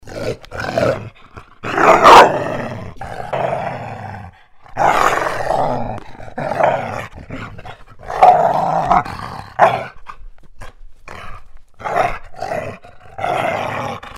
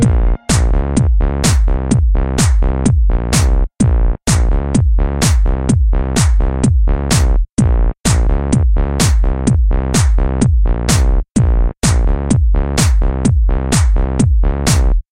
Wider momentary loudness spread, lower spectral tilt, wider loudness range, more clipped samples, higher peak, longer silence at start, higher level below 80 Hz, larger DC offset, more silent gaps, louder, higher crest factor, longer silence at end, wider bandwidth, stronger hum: first, 22 LU vs 2 LU; about the same, -4.5 dB/octave vs -5.5 dB/octave; first, 10 LU vs 0 LU; first, 0.2% vs under 0.1%; about the same, 0 dBFS vs 0 dBFS; about the same, 0.05 s vs 0 s; second, -38 dBFS vs -14 dBFS; neither; second, none vs 7.52-7.57 s, 8.00-8.04 s, 11.31-11.35 s; about the same, -15 LUFS vs -14 LUFS; first, 18 dB vs 12 dB; about the same, 0 s vs 0.1 s; about the same, 16 kHz vs 15 kHz; neither